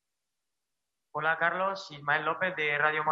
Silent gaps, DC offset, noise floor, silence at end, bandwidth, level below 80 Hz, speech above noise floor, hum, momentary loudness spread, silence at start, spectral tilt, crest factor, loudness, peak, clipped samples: none; under 0.1%; -87 dBFS; 0 s; 7.8 kHz; -80 dBFS; 58 dB; none; 7 LU; 1.15 s; -4.5 dB/octave; 20 dB; -29 LUFS; -12 dBFS; under 0.1%